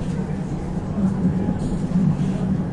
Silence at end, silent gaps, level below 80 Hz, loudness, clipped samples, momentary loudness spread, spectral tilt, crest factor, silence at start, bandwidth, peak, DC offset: 0 s; none; -36 dBFS; -23 LUFS; under 0.1%; 6 LU; -9 dB/octave; 12 dB; 0 s; 10.5 kHz; -8 dBFS; under 0.1%